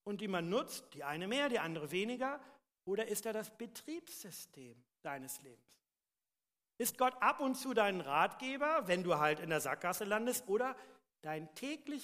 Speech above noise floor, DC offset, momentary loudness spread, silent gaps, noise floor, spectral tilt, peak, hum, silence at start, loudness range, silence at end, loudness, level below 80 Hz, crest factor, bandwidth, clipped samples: over 52 dB; under 0.1%; 15 LU; none; under -90 dBFS; -3.5 dB/octave; -18 dBFS; none; 0.05 s; 11 LU; 0 s; -37 LUFS; -82 dBFS; 22 dB; 15.5 kHz; under 0.1%